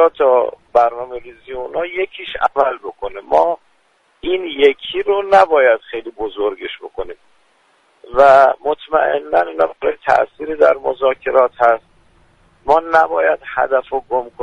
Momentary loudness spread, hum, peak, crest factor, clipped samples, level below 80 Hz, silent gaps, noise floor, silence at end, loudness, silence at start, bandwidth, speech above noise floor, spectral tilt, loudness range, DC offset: 16 LU; none; 0 dBFS; 16 dB; under 0.1%; -48 dBFS; none; -58 dBFS; 0 s; -15 LUFS; 0 s; 9 kHz; 43 dB; -4.5 dB/octave; 4 LU; under 0.1%